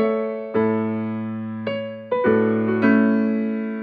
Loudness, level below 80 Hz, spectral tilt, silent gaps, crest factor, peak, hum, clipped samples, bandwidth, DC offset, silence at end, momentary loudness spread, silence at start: -21 LUFS; -66 dBFS; -10 dB/octave; none; 14 dB; -6 dBFS; none; under 0.1%; 4.9 kHz; under 0.1%; 0 s; 10 LU; 0 s